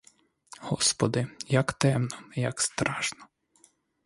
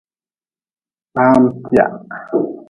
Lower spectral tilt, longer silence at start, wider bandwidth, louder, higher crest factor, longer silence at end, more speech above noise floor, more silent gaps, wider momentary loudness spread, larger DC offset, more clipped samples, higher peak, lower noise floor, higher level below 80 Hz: second, -4 dB/octave vs -8.5 dB/octave; second, 0.6 s vs 1.15 s; first, 11.5 kHz vs 8 kHz; second, -28 LUFS vs -15 LUFS; first, 26 dB vs 16 dB; first, 0.8 s vs 0.05 s; second, 36 dB vs over 76 dB; neither; second, 9 LU vs 12 LU; neither; neither; second, -4 dBFS vs 0 dBFS; second, -64 dBFS vs under -90 dBFS; second, -60 dBFS vs -52 dBFS